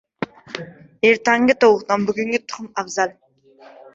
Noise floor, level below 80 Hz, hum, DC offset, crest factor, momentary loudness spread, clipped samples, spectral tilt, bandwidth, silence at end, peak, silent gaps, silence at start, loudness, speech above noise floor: -48 dBFS; -60 dBFS; none; under 0.1%; 18 dB; 18 LU; under 0.1%; -4 dB/octave; 7.8 kHz; 0.85 s; -2 dBFS; none; 0.2 s; -18 LUFS; 30 dB